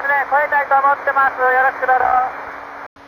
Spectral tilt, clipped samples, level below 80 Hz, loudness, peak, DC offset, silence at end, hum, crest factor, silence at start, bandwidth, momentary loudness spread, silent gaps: -4.5 dB/octave; under 0.1%; -54 dBFS; -15 LUFS; -4 dBFS; under 0.1%; 0.05 s; none; 12 dB; 0 s; 18.5 kHz; 16 LU; 2.86-2.96 s